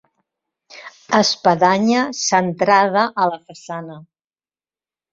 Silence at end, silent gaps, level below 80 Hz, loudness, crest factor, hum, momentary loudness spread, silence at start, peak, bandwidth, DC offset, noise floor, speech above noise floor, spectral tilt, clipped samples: 1.1 s; none; -62 dBFS; -16 LUFS; 18 dB; none; 18 LU; 0.75 s; -2 dBFS; 7.8 kHz; under 0.1%; under -90 dBFS; over 73 dB; -3.5 dB/octave; under 0.1%